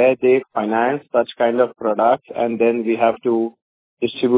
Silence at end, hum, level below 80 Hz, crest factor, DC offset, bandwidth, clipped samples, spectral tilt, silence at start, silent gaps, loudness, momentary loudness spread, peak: 0 s; none; -64 dBFS; 16 dB; under 0.1%; 4 kHz; under 0.1%; -9.5 dB/octave; 0 s; 3.62-3.97 s; -19 LUFS; 5 LU; -2 dBFS